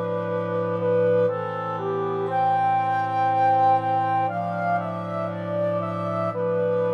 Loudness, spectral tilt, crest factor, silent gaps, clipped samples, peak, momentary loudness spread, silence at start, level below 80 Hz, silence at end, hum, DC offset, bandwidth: -23 LUFS; -8.5 dB/octave; 12 dB; none; under 0.1%; -10 dBFS; 8 LU; 0 s; -80 dBFS; 0 s; none; under 0.1%; 6.6 kHz